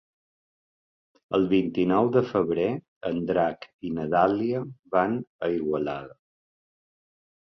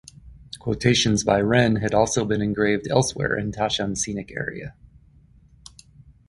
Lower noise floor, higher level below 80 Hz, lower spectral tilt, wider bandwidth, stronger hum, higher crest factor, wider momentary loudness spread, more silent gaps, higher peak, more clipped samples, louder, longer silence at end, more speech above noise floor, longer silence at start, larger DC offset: first, under -90 dBFS vs -53 dBFS; second, -60 dBFS vs -46 dBFS; first, -9 dB/octave vs -4.5 dB/octave; second, 6.2 kHz vs 11.5 kHz; neither; about the same, 20 dB vs 20 dB; about the same, 10 LU vs 12 LU; first, 2.88-3.01 s, 3.74-3.79 s, 4.79-4.83 s, 5.27-5.39 s vs none; about the same, -6 dBFS vs -4 dBFS; neither; second, -26 LUFS vs -22 LUFS; second, 1.35 s vs 1.6 s; first, over 65 dB vs 31 dB; first, 1.3 s vs 0.25 s; neither